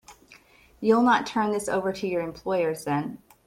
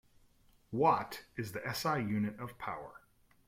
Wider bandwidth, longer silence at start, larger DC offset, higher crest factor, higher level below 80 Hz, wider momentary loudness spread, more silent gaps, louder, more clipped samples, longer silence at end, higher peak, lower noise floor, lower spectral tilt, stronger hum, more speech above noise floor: about the same, 15.5 kHz vs 16.5 kHz; second, 0.1 s vs 0.7 s; neither; about the same, 18 dB vs 22 dB; first, -62 dBFS vs -68 dBFS; second, 9 LU vs 13 LU; neither; first, -25 LUFS vs -35 LUFS; neither; second, 0.3 s vs 0.5 s; first, -8 dBFS vs -16 dBFS; second, -55 dBFS vs -67 dBFS; about the same, -5.5 dB/octave vs -5.5 dB/octave; neither; about the same, 30 dB vs 32 dB